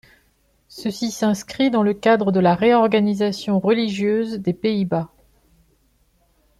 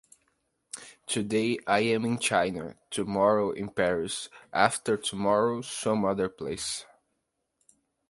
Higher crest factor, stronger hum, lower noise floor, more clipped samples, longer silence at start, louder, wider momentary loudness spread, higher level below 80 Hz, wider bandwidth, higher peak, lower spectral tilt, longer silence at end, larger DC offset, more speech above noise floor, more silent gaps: second, 16 dB vs 24 dB; neither; second, -62 dBFS vs -80 dBFS; neither; about the same, 0.75 s vs 0.75 s; first, -19 LUFS vs -28 LUFS; about the same, 9 LU vs 11 LU; about the same, -58 dBFS vs -62 dBFS; first, 13 kHz vs 11.5 kHz; about the same, -4 dBFS vs -6 dBFS; first, -6 dB/octave vs -4 dB/octave; first, 1.55 s vs 1.25 s; neither; second, 43 dB vs 52 dB; neither